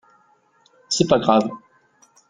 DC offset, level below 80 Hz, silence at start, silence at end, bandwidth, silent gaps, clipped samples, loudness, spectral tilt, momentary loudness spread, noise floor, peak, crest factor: under 0.1%; -58 dBFS; 0.9 s; 0.7 s; 9.6 kHz; none; under 0.1%; -19 LUFS; -4.5 dB/octave; 14 LU; -59 dBFS; -2 dBFS; 22 dB